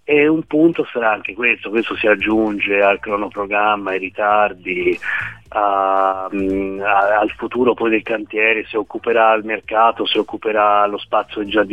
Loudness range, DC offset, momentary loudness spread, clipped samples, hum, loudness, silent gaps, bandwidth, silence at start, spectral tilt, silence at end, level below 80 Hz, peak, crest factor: 2 LU; 0.2%; 6 LU; under 0.1%; none; -17 LUFS; none; 5.8 kHz; 0.1 s; -6.5 dB/octave; 0 s; -50 dBFS; -2 dBFS; 16 dB